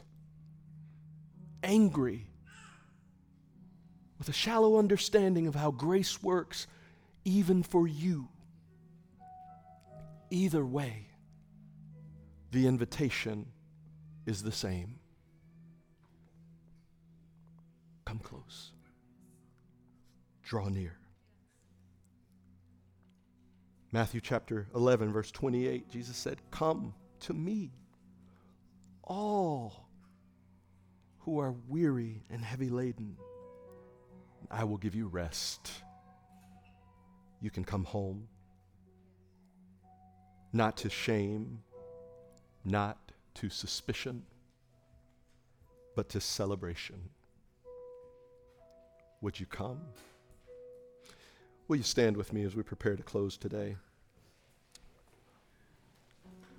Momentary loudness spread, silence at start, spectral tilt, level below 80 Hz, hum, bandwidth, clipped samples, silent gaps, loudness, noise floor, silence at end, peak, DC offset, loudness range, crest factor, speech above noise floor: 25 LU; 0.15 s; -5.5 dB/octave; -62 dBFS; none; over 20 kHz; under 0.1%; none; -34 LUFS; -68 dBFS; 0.05 s; -12 dBFS; under 0.1%; 15 LU; 26 dB; 35 dB